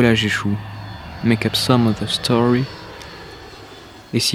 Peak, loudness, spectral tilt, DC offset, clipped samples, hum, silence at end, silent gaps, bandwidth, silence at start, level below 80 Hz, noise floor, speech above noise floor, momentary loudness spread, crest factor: 0 dBFS; -18 LUFS; -5 dB/octave; under 0.1%; under 0.1%; none; 0 s; none; 15.5 kHz; 0 s; -44 dBFS; -40 dBFS; 23 dB; 21 LU; 20 dB